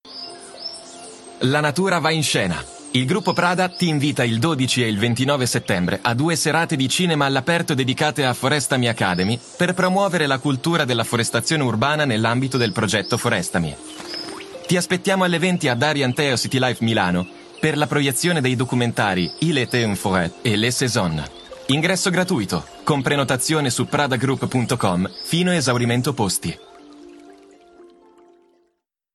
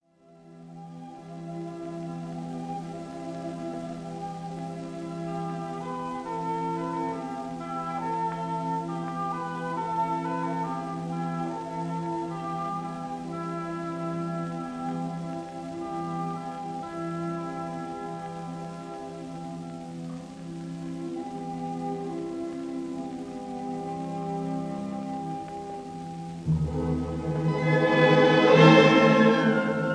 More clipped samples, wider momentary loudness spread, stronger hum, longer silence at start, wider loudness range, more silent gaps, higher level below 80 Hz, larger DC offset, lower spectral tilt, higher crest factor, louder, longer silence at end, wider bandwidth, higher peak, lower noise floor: neither; second, 7 LU vs 17 LU; neither; second, 0.05 s vs 0.3 s; second, 2 LU vs 12 LU; neither; about the same, -52 dBFS vs -54 dBFS; neither; second, -4.5 dB/octave vs -6.5 dB/octave; second, 18 dB vs 24 dB; first, -20 LUFS vs -28 LUFS; first, 1.3 s vs 0 s; first, 13 kHz vs 10.5 kHz; about the same, -2 dBFS vs -4 dBFS; first, -71 dBFS vs -55 dBFS